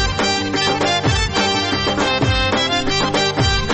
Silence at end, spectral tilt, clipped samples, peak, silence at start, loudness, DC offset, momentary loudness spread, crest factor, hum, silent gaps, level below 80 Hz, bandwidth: 0 s; -4 dB/octave; under 0.1%; -6 dBFS; 0 s; -17 LUFS; under 0.1%; 1 LU; 12 dB; none; none; -30 dBFS; 8.6 kHz